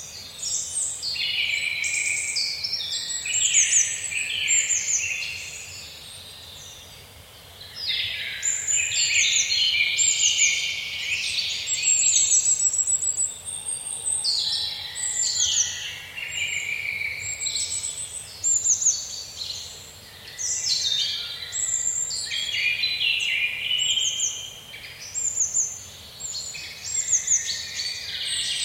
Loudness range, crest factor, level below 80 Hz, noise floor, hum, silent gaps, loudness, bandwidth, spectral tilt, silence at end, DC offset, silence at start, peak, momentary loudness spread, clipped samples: 6 LU; 20 dB; -58 dBFS; -46 dBFS; none; none; -22 LUFS; 16.5 kHz; 3 dB/octave; 0 s; under 0.1%; 0 s; -6 dBFS; 17 LU; under 0.1%